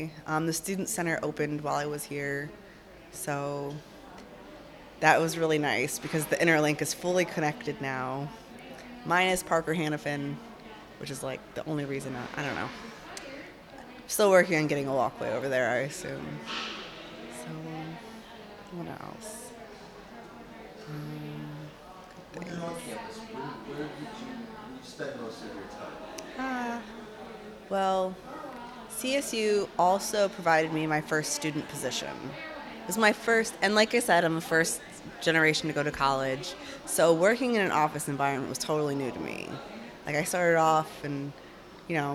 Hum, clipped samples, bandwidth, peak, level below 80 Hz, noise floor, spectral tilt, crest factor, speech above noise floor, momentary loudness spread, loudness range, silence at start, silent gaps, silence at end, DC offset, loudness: none; under 0.1%; 18.5 kHz; -6 dBFS; -62 dBFS; -50 dBFS; -4 dB/octave; 26 dB; 22 dB; 21 LU; 14 LU; 0 s; none; 0 s; under 0.1%; -29 LUFS